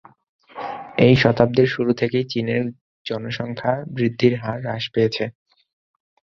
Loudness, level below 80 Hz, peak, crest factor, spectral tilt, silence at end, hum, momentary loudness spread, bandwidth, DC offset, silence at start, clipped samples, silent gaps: -20 LUFS; -52 dBFS; 0 dBFS; 20 dB; -7.5 dB/octave; 1.05 s; none; 15 LU; 7 kHz; under 0.1%; 0.55 s; under 0.1%; 2.81-3.05 s